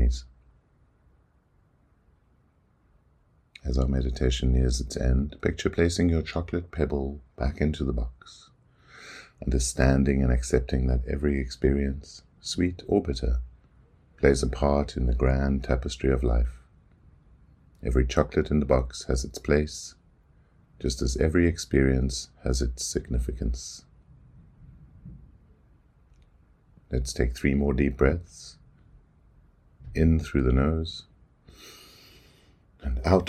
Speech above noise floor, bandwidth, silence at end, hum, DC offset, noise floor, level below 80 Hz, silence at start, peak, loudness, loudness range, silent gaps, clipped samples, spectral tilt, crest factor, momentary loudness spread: 39 dB; 12.5 kHz; 0 s; none; under 0.1%; -64 dBFS; -32 dBFS; 0 s; -4 dBFS; -27 LUFS; 7 LU; none; under 0.1%; -6 dB/octave; 24 dB; 15 LU